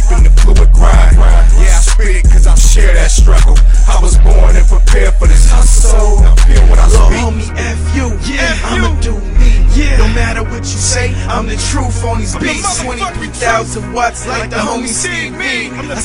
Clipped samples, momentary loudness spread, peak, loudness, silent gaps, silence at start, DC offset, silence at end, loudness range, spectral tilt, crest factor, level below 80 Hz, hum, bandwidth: 0.7%; 8 LU; 0 dBFS; -11 LUFS; none; 0 s; under 0.1%; 0 s; 6 LU; -4.5 dB/octave; 6 dB; -8 dBFS; none; 11 kHz